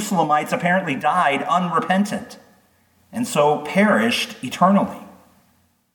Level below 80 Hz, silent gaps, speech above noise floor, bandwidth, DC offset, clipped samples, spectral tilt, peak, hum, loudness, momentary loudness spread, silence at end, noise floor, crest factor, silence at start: -66 dBFS; none; 42 dB; 19 kHz; under 0.1%; under 0.1%; -5 dB/octave; -2 dBFS; none; -19 LUFS; 11 LU; 0.85 s; -61 dBFS; 18 dB; 0 s